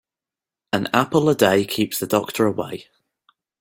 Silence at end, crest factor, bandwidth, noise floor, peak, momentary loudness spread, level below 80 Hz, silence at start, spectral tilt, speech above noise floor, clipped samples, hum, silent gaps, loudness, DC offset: 0.8 s; 20 dB; 17 kHz; -89 dBFS; -2 dBFS; 11 LU; -58 dBFS; 0.75 s; -5 dB/octave; 70 dB; under 0.1%; none; none; -20 LUFS; under 0.1%